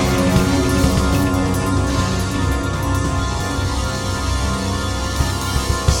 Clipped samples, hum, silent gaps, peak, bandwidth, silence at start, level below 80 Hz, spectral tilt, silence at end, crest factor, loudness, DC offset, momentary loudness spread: under 0.1%; none; none; 0 dBFS; 17.5 kHz; 0 s; -24 dBFS; -5 dB/octave; 0 s; 16 dB; -19 LUFS; under 0.1%; 5 LU